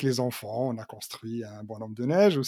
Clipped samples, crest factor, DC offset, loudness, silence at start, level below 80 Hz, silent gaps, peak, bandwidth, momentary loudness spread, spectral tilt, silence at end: under 0.1%; 18 dB; under 0.1%; -30 LUFS; 0 s; -74 dBFS; none; -10 dBFS; 17 kHz; 17 LU; -6 dB/octave; 0 s